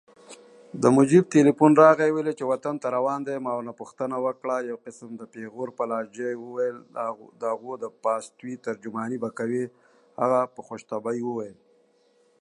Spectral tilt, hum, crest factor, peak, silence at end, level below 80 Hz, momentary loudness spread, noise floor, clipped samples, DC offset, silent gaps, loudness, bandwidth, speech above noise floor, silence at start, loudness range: -7 dB/octave; none; 22 dB; -2 dBFS; 0.9 s; -76 dBFS; 20 LU; -63 dBFS; under 0.1%; under 0.1%; none; -25 LUFS; 10.5 kHz; 39 dB; 0.3 s; 11 LU